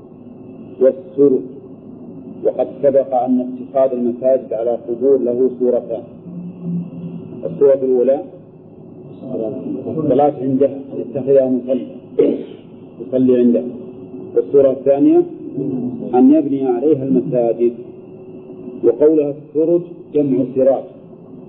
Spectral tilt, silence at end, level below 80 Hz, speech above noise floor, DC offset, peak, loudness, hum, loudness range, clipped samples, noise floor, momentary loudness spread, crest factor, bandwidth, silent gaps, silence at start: -13 dB/octave; 0 s; -62 dBFS; 24 dB; under 0.1%; -2 dBFS; -16 LUFS; none; 4 LU; under 0.1%; -39 dBFS; 20 LU; 14 dB; 3.7 kHz; none; 0 s